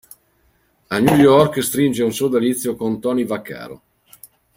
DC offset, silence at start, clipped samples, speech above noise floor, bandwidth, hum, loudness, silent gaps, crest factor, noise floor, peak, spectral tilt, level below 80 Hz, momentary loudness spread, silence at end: under 0.1%; 0.9 s; under 0.1%; 44 dB; 16.5 kHz; none; -17 LUFS; none; 18 dB; -60 dBFS; -2 dBFS; -5.5 dB/octave; -52 dBFS; 15 LU; 0.8 s